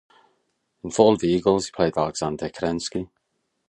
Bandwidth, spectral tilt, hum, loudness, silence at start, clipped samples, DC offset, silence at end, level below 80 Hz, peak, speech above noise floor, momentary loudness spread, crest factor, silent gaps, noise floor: 11 kHz; -5.5 dB/octave; none; -23 LUFS; 0.85 s; under 0.1%; under 0.1%; 0.65 s; -52 dBFS; -2 dBFS; 53 dB; 13 LU; 22 dB; none; -75 dBFS